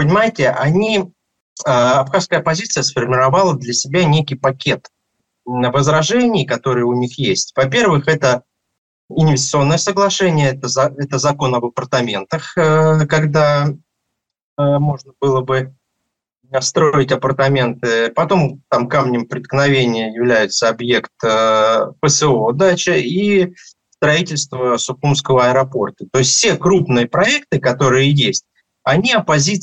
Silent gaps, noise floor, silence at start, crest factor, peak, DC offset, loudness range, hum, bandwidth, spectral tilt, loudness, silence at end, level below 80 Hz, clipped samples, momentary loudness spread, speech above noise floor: 1.41-1.56 s, 8.78-9.08 s, 14.43-14.57 s; -76 dBFS; 0 s; 14 dB; -2 dBFS; under 0.1%; 3 LU; none; 8.8 kHz; -4.5 dB/octave; -15 LUFS; 0 s; -52 dBFS; under 0.1%; 7 LU; 61 dB